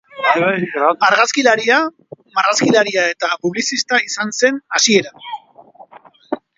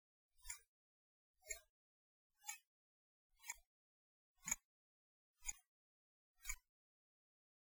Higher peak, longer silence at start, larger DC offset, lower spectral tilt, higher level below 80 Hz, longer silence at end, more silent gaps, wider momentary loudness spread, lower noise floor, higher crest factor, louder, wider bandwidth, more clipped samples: first, 0 dBFS vs -26 dBFS; second, 0.15 s vs 0.35 s; neither; first, -2.5 dB/octave vs 0.5 dB/octave; about the same, -66 dBFS vs -70 dBFS; second, 0.2 s vs 1 s; second, none vs 0.67-1.34 s, 1.70-2.30 s, 2.67-3.30 s, 3.66-4.35 s, 4.64-5.34 s, 5.68-6.35 s; about the same, 14 LU vs 13 LU; second, -44 dBFS vs under -90 dBFS; second, 16 dB vs 32 dB; first, -15 LUFS vs -52 LUFS; second, 7.8 kHz vs over 20 kHz; neither